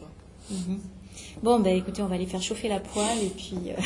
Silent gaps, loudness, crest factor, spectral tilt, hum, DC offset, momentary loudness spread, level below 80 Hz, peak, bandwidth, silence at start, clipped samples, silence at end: none; -28 LUFS; 18 dB; -5 dB/octave; none; under 0.1%; 20 LU; -50 dBFS; -10 dBFS; 11.5 kHz; 0 s; under 0.1%; 0 s